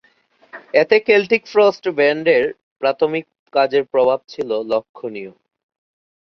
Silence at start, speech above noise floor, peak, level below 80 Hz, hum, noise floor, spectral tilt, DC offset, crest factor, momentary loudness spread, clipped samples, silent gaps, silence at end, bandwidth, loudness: 0.55 s; 39 dB; -2 dBFS; -64 dBFS; none; -56 dBFS; -5.5 dB/octave; under 0.1%; 18 dB; 13 LU; under 0.1%; 2.63-2.76 s, 3.39-3.46 s, 4.89-4.94 s; 1 s; 6.4 kHz; -17 LUFS